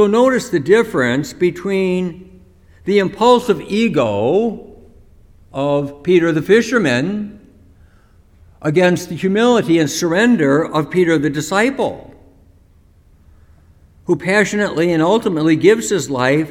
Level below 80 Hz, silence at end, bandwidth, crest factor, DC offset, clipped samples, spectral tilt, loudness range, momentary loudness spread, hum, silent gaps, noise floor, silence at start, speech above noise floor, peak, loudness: -50 dBFS; 0 s; 16.5 kHz; 16 dB; under 0.1%; under 0.1%; -5.5 dB/octave; 5 LU; 9 LU; none; none; -49 dBFS; 0 s; 34 dB; 0 dBFS; -15 LUFS